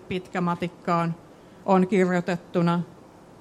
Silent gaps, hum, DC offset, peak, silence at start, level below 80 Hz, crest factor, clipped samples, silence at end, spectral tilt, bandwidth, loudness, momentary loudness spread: none; none; under 0.1%; -6 dBFS; 0 s; -62 dBFS; 18 dB; under 0.1%; 0.5 s; -7.5 dB/octave; 10.5 kHz; -25 LUFS; 10 LU